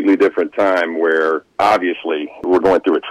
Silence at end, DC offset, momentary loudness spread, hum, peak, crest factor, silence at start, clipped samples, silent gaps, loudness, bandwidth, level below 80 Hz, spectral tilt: 0 s; under 0.1%; 6 LU; none; -6 dBFS; 10 dB; 0 s; under 0.1%; none; -16 LUFS; 12 kHz; -52 dBFS; -5.5 dB/octave